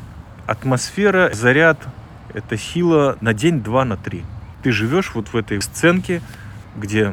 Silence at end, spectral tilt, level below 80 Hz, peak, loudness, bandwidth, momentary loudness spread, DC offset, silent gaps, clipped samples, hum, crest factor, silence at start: 0 s; -5.5 dB/octave; -42 dBFS; 0 dBFS; -18 LUFS; 17 kHz; 19 LU; under 0.1%; none; under 0.1%; none; 18 dB; 0 s